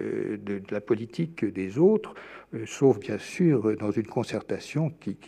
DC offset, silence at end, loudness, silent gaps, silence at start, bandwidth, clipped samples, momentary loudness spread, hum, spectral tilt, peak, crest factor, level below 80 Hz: under 0.1%; 0 s; -27 LUFS; none; 0 s; 11 kHz; under 0.1%; 11 LU; none; -7.5 dB/octave; -10 dBFS; 18 dB; -68 dBFS